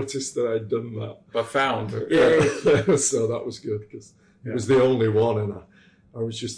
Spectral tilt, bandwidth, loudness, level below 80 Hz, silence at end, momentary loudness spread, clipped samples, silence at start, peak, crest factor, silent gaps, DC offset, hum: -5 dB/octave; 10.5 kHz; -23 LUFS; -56 dBFS; 0 s; 14 LU; under 0.1%; 0 s; -10 dBFS; 12 dB; none; under 0.1%; none